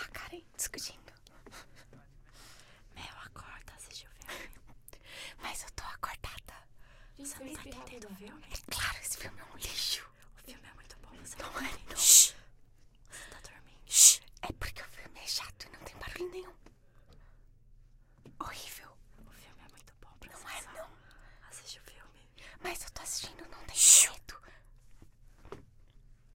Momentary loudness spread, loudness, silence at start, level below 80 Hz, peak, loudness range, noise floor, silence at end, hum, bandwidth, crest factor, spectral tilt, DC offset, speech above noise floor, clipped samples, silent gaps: 30 LU; -26 LUFS; 0 s; -56 dBFS; -6 dBFS; 23 LU; -59 dBFS; 0.75 s; none; 16 kHz; 30 dB; 1 dB/octave; under 0.1%; 14 dB; under 0.1%; none